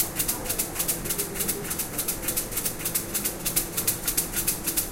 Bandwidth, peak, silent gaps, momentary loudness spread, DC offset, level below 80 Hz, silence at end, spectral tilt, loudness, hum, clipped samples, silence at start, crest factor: 17 kHz; -6 dBFS; none; 3 LU; under 0.1%; -44 dBFS; 0 s; -2 dB/octave; -26 LUFS; none; under 0.1%; 0 s; 22 dB